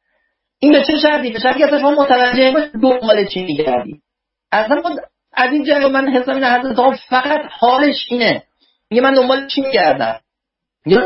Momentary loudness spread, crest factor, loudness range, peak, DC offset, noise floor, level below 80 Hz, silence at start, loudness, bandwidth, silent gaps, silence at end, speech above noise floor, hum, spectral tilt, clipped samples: 7 LU; 14 dB; 3 LU; 0 dBFS; under 0.1%; -80 dBFS; -52 dBFS; 0.6 s; -14 LUFS; 5.8 kHz; none; 0 s; 67 dB; none; -8 dB/octave; under 0.1%